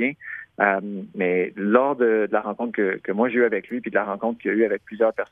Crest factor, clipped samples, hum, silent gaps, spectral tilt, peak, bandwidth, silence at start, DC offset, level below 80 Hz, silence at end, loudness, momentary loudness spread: 20 dB; under 0.1%; none; none; -9.5 dB/octave; -2 dBFS; 3.7 kHz; 0 s; under 0.1%; -70 dBFS; 0.1 s; -23 LUFS; 7 LU